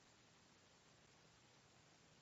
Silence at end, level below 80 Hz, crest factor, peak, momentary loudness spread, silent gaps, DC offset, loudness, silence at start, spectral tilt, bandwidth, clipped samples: 0 s; -88 dBFS; 14 dB; -56 dBFS; 0 LU; none; under 0.1%; -69 LUFS; 0 s; -2.5 dB/octave; 7.6 kHz; under 0.1%